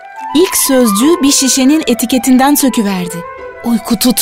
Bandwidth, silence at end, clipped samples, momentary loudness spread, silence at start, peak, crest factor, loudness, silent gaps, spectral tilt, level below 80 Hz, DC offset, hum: 16.5 kHz; 0 s; under 0.1%; 11 LU; 0 s; 0 dBFS; 10 dB; -10 LUFS; none; -3 dB/octave; -42 dBFS; under 0.1%; none